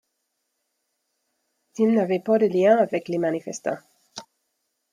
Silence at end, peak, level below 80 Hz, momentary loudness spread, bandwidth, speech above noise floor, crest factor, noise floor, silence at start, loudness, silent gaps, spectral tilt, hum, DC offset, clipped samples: 0.7 s; -6 dBFS; -76 dBFS; 23 LU; 12.5 kHz; 56 dB; 18 dB; -77 dBFS; 1.8 s; -22 LUFS; none; -6 dB/octave; none; under 0.1%; under 0.1%